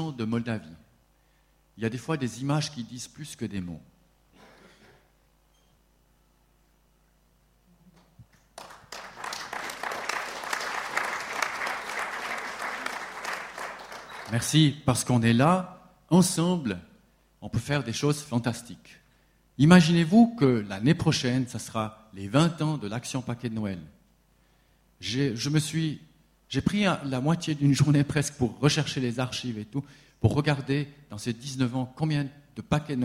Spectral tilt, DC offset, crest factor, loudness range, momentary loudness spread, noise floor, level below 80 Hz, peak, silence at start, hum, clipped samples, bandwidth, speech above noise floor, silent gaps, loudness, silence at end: -5.5 dB/octave; under 0.1%; 24 dB; 12 LU; 17 LU; -64 dBFS; -56 dBFS; -4 dBFS; 0 s; none; under 0.1%; 16 kHz; 39 dB; none; -27 LUFS; 0 s